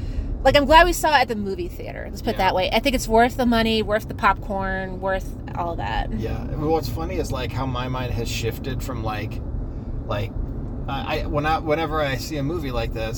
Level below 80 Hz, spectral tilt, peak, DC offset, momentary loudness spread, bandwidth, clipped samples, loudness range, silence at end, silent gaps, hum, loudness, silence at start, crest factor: -32 dBFS; -5 dB/octave; 0 dBFS; under 0.1%; 12 LU; 18 kHz; under 0.1%; 9 LU; 0 s; none; none; -23 LUFS; 0 s; 22 dB